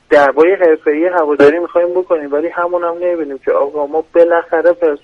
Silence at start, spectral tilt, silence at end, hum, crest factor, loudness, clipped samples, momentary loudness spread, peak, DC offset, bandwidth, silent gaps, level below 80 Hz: 0.1 s; -6 dB/octave; 0.05 s; none; 12 dB; -13 LUFS; under 0.1%; 7 LU; 0 dBFS; under 0.1%; 7 kHz; none; -54 dBFS